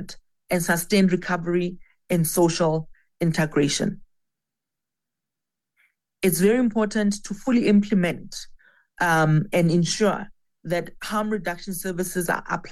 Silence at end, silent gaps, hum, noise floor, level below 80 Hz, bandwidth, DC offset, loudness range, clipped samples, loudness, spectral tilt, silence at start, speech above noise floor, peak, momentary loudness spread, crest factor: 0 s; none; none; -87 dBFS; -50 dBFS; 16 kHz; under 0.1%; 5 LU; under 0.1%; -23 LUFS; -5.5 dB/octave; 0 s; 65 dB; -8 dBFS; 10 LU; 16 dB